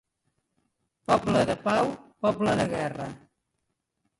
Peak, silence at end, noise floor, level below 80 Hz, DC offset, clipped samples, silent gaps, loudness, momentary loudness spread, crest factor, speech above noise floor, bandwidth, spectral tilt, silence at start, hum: -8 dBFS; 1.05 s; -80 dBFS; -56 dBFS; under 0.1%; under 0.1%; none; -26 LUFS; 12 LU; 20 dB; 54 dB; 11.5 kHz; -6 dB/octave; 1.1 s; none